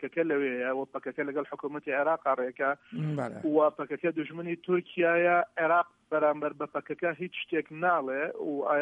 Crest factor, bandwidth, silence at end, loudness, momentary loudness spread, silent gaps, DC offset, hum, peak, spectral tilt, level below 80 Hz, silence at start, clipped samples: 16 dB; 9.2 kHz; 0 s; -30 LUFS; 9 LU; none; under 0.1%; none; -14 dBFS; -8 dB/octave; -80 dBFS; 0 s; under 0.1%